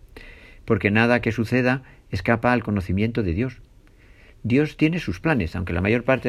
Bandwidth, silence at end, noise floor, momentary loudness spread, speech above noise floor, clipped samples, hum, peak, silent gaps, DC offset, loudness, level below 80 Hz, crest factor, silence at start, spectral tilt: 13 kHz; 0 s; -50 dBFS; 9 LU; 29 dB; under 0.1%; none; -4 dBFS; none; under 0.1%; -22 LUFS; -44 dBFS; 20 dB; 0.15 s; -7.5 dB/octave